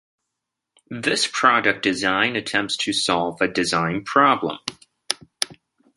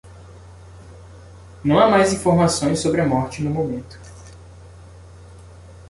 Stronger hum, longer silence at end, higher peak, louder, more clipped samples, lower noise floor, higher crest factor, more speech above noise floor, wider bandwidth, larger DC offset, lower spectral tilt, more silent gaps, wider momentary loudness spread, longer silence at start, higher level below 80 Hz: neither; first, 0.45 s vs 0.05 s; about the same, 0 dBFS vs -2 dBFS; about the same, -20 LUFS vs -19 LUFS; neither; first, -82 dBFS vs -42 dBFS; about the same, 22 dB vs 20 dB; first, 61 dB vs 24 dB; first, 16 kHz vs 11.5 kHz; neither; second, -3 dB/octave vs -5.5 dB/octave; neither; second, 11 LU vs 25 LU; first, 0.9 s vs 0.05 s; second, -60 dBFS vs -44 dBFS